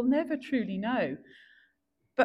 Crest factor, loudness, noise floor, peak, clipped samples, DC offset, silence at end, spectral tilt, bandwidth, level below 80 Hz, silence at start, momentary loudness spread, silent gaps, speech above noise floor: 18 dB; -31 LUFS; -77 dBFS; -12 dBFS; under 0.1%; under 0.1%; 0 s; -7.5 dB/octave; 5.8 kHz; -70 dBFS; 0 s; 8 LU; none; 47 dB